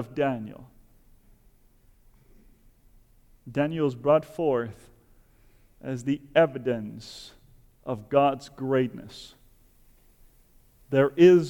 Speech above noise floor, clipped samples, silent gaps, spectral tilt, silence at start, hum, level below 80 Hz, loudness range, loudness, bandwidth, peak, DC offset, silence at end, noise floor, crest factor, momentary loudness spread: 34 dB; under 0.1%; none; -7 dB/octave; 0 s; none; -58 dBFS; 7 LU; -26 LUFS; 10.5 kHz; -6 dBFS; under 0.1%; 0 s; -59 dBFS; 20 dB; 20 LU